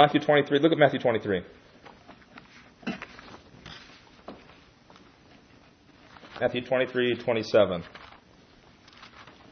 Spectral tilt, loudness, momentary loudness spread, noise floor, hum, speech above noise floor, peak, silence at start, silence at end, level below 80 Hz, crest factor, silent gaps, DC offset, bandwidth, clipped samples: -6.5 dB/octave; -25 LUFS; 26 LU; -56 dBFS; none; 32 dB; -4 dBFS; 0 s; 0.3 s; -64 dBFS; 24 dB; none; under 0.1%; 6.6 kHz; under 0.1%